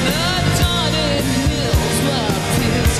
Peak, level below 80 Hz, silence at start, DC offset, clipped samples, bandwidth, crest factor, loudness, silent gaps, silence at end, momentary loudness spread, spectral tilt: -4 dBFS; -26 dBFS; 0 s; under 0.1%; under 0.1%; 15.5 kHz; 12 dB; -17 LUFS; none; 0 s; 2 LU; -4.5 dB/octave